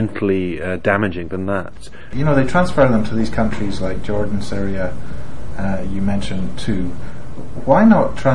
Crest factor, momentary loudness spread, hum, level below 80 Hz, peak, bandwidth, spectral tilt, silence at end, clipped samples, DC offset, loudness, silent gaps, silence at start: 18 dB; 18 LU; none; -34 dBFS; 0 dBFS; 11.5 kHz; -7.5 dB/octave; 0 s; under 0.1%; 10%; -19 LUFS; none; 0 s